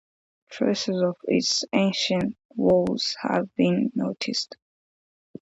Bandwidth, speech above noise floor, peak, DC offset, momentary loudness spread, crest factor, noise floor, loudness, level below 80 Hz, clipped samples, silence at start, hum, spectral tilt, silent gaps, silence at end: 8 kHz; over 66 dB; -8 dBFS; under 0.1%; 6 LU; 18 dB; under -90 dBFS; -24 LUFS; -62 dBFS; under 0.1%; 0.5 s; none; -4.5 dB/octave; 2.45-2.49 s; 0.85 s